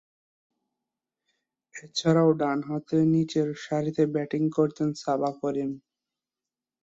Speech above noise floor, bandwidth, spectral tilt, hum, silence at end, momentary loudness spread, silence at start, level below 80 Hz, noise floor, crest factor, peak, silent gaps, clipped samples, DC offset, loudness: over 65 dB; 7.8 kHz; -7 dB/octave; none; 1.05 s; 11 LU; 1.75 s; -70 dBFS; under -90 dBFS; 18 dB; -10 dBFS; none; under 0.1%; under 0.1%; -26 LUFS